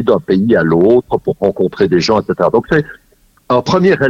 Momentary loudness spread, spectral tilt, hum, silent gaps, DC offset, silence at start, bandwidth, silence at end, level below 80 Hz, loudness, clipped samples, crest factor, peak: 6 LU; -6.5 dB/octave; none; none; under 0.1%; 0 s; 7.4 kHz; 0 s; -42 dBFS; -13 LUFS; under 0.1%; 12 dB; 0 dBFS